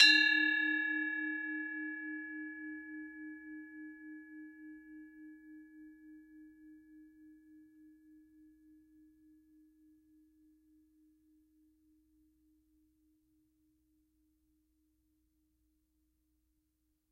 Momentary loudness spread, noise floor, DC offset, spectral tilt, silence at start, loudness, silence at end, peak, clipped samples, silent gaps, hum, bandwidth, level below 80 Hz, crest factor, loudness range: 27 LU; -81 dBFS; under 0.1%; 0.5 dB/octave; 0 s; -33 LUFS; 9.8 s; -12 dBFS; under 0.1%; none; none; 15 kHz; -82 dBFS; 28 dB; 26 LU